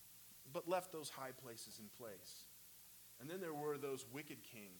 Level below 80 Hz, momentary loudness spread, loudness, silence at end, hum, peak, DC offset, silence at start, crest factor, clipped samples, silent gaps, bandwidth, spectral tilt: -84 dBFS; 15 LU; -50 LUFS; 0 s; 60 Hz at -80 dBFS; -28 dBFS; under 0.1%; 0 s; 22 dB; under 0.1%; none; 19 kHz; -4 dB/octave